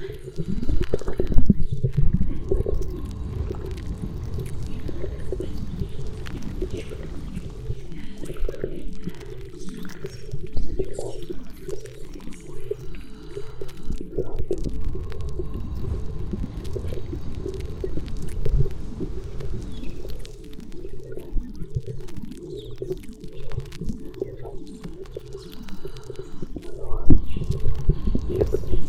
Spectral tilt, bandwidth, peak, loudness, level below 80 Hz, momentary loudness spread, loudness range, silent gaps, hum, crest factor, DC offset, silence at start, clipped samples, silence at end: -8 dB/octave; 8 kHz; 0 dBFS; -31 LUFS; -30 dBFS; 14 LU; 9 LU; none; none; 20 dB; under 0.1%; 0 s; under 0.1%; 0 s